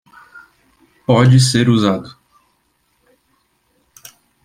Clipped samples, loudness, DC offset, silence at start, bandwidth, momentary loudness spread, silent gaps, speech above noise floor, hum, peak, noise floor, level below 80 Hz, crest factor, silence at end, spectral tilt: under 0.1%; -13 LUFS; under 0.1%; 1.1 s; 14.5 kHz; 16 LU; none; 51 dB; none; 0 dBFS; -63 dBFS; -52 dBFS; 18 dB; 2.35 s; -6 dB/octave